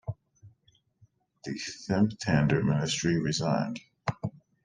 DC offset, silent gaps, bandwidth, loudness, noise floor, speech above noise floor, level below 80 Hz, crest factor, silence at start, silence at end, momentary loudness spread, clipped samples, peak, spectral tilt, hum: under 0.1%; none; 9.8 kHz; -29 LUFS; -68 dBFS; 40 dB; -58 dBFS; 20 dB; 0.05 s; 0.35 s; 14 LU; under 0.1%; -10 dBFS; -5.5 dB/octave; none